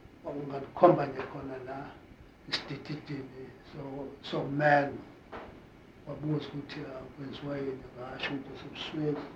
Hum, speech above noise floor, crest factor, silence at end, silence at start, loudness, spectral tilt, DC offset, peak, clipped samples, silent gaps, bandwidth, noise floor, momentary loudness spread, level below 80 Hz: none; 21 dB; 26 dB; 0 s; 0 s; -33 LUFS; -7 dB/octave; under 0.1%; -6 dBFS; under 0.1%; none; 9.2 kHz; -53 dBFS; 21 LU; -62 dBFS